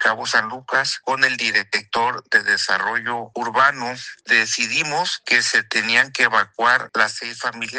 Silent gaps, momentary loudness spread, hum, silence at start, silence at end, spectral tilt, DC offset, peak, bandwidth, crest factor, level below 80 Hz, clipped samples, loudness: none; 9 LU; none; 0 s; 0 s; -1 dB/octave; under 0.1%; -2 dBFS; 10 kHz; 20 dB; -70 dBFS; under 0.1%; -18 LUFS